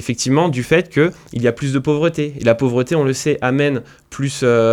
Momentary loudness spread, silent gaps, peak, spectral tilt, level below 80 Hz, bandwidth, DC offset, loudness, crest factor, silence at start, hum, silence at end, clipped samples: 4 LU; none; 0 dBFS; -5.5 dB/octave; -48 dBFS; 15.5 kHz; under 0.1%; -17 LUFS; 16 dB; 0 s; none; 0 s; under 0.1%